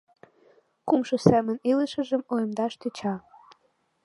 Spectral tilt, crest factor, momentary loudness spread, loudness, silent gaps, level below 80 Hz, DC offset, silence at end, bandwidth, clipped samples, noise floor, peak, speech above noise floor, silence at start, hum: -7 dB/octave; 24 dB; 11 LU; -26 LUFS; none; -62 dBFS; under 0.1%; 0.85 s; 11.5 kHz; under 0.1%; -69 dBFS; -2 dBFS; 45 dB; 0.85 s; none